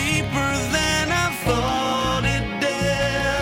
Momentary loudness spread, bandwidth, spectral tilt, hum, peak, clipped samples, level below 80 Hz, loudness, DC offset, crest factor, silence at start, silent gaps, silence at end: 3 LU; 16.5 kHz; -4 dB/octave; none; -8 dBFS; under 0.1%; -34 dBFS; -21 LUFS; under 0.1%; 14 dB; 0 s; none; 0 s